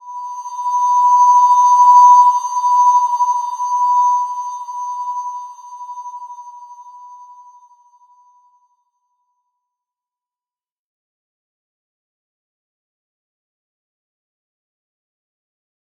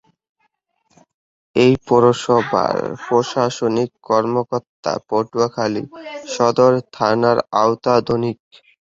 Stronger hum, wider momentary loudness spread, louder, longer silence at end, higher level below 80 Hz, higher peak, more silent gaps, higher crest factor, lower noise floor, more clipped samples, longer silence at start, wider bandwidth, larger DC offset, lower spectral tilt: neither; first, 23 LU vs 10 LU; first, -12 LUFS vs -18 LUFS; first, 8.75 s vs 0.65 s; second, under -90 dBFS vs -54 dBFS; about the same, -2 dBFS vs -2 dBFS; second, none vs 4.69-4.83 s; about the same, 16 dB vs 18 dB; first, under -90 dBFS vs -68 dBFS; neither; second, 0.05 s vs 1.55 s; first, 9 kHz vs 8 kHz; neither; second, 4 dB/octave vs -6 dB/octave